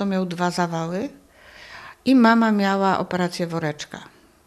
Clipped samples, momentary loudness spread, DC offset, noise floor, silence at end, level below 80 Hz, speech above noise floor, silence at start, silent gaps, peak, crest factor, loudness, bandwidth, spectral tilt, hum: under 0.1%; 21 LU; under 0.1%; -46 dBFS; 0.4 s; -62 dBFS; 25 dB; 0 s; none; -4 dBFS; 18 dB; -21 LUFS; 13.5 kHz; -6 dB/octave; none